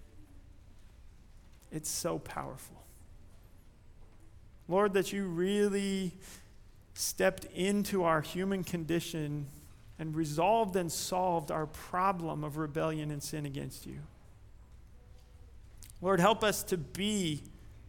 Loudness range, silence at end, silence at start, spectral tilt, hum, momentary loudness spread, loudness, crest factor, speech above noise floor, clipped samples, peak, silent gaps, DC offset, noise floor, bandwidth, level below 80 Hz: 9 LU; 0 s; 0 s; -4.5 dB/octave; none; 18 LU; -33 LUFS; 22 dB; 23 dB; under 0.1%; -12 dBFS; none; under 0.1%; -56 dBFS; 19 kHz; -56 dBFS